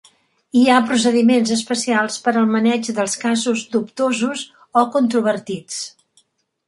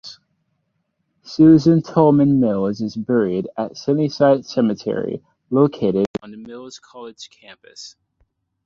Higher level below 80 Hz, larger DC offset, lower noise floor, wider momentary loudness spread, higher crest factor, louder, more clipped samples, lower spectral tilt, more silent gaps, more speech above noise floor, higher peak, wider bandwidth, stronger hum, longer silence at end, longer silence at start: second, -66 dBFS vs -56 dBFS; neither; second, -60 dBFS vs -71 dBFS; second, 11 LU vs 24 LU; about the same, 16 dB vs 18 dB; about the same, -18 LUFS vs -17 LUFS; neither; second, -3.5 dB/octave vs -8 dB/octave; second, none vs 6.07-6.14 s; second, 43 dB vs 53 dB; about the same, -2 dBFS vs -2 dBFS; first, 11.5 kHz vs 7.4 kHz; neither; about the same, 0.8 s vs 0.75 s; first, 0.55 s vs 0.05 s